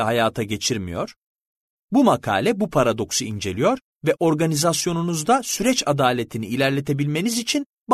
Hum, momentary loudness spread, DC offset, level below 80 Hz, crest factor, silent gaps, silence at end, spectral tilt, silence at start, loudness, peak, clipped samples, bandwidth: none; 7 LU; under 0.1%; -52 dBFS; 16 dB; 1.26-1.88 s, 3.84-3.93 s, 7.66-7.85 s; 0 s; -4.5 dB/octave; 0 s; -21 LUFS; -4 dBFS; under 0.1%; 13.5 kHz